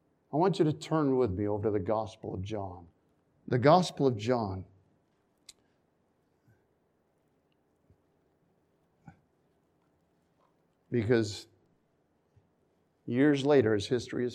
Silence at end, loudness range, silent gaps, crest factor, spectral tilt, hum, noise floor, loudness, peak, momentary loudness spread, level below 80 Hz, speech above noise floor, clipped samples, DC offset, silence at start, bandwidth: 0 s; 7 LU; none; 24 dB; -7 dB/octave; none; -73 dBFS; -29 LUFS; -10 dBFS; 15 LU; -68 dBFS; 45 dB; under 0.1%; under 0.1%; 0.3 s; 11.5 kHz